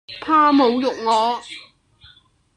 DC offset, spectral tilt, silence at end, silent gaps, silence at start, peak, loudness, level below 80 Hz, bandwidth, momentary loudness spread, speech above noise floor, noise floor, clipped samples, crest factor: under 0.1%; -4 dB/octave; 0.95 s; none; 0.1 s; -4 dBFS; -17 LUFS; -60 dBFS; 11 kHz; 18 LU; 36 dB; -53 dBFS; under 0.1%; 16 dB